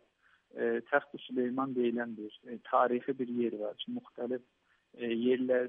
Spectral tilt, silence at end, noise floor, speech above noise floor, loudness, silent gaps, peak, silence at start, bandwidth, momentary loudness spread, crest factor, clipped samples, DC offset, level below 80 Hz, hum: -8.5 dB/octave; 0 s; -70 dBFS; 37 dB; -34 LUFS; none; -14 dBFS; 0.55 s; 3.8 kHz; 12 LU; 20 dB; under 0.1%; under 0.1%; -86 dBFS; none